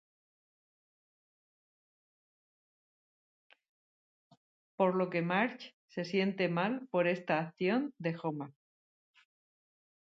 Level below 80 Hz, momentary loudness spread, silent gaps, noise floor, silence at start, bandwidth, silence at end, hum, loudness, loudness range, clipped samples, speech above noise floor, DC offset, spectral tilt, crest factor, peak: -84 dBFS; 11 LU; 5.73-5.88 s; under -90 dBFS; 4.8 s; 7.4 kHz; 1.65 s; none; -33 LUFS; 5 LU; under 0.1%; over 57 dB; under 0.1%; -5 dB/octave; 22 dB; -14 dBFS